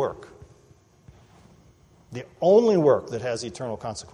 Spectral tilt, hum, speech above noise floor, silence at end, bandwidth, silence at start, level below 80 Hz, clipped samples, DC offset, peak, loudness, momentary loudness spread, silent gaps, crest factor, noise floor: -6 dB/octave; none; 34 dB; 0.1 s; 10.5 kHz; 0 s; -60 dBFS; under 0.1%; under 0.1%; -8 dBFS; -23 LUFS; 22 LU; none; 18 dB; -56 dBFS